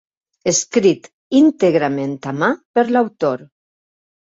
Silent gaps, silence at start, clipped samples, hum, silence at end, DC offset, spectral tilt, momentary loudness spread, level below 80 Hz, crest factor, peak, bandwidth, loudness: 1.13-1.30 s, 2.65-2.74 s; 0.45 s; under 0.1%; none; 0.8 s; under 0.1%; -4.5 dB/octave; 10 LU; -62 dBFS; 16 dB; -2 dBFS; 8 kHz; -17 LUFS